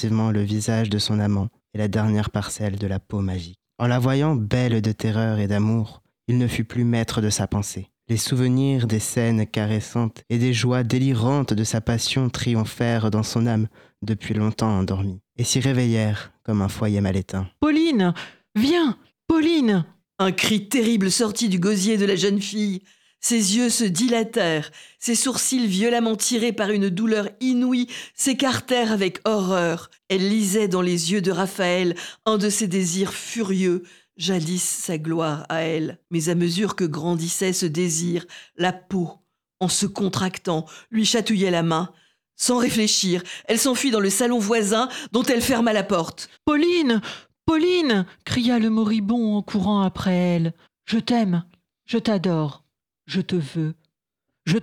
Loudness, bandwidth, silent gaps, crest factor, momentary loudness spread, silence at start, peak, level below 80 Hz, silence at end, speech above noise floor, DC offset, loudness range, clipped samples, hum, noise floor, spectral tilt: -22 LUFS; 17.5 kHz; none; 18 dB; 8 LU; 0 s; -4 dBFS; -52 dBFS; 0 s; 60 dB; under 0.1%; 3 LU; under 0.1%; none; -82 dBFS; -5 dB/octave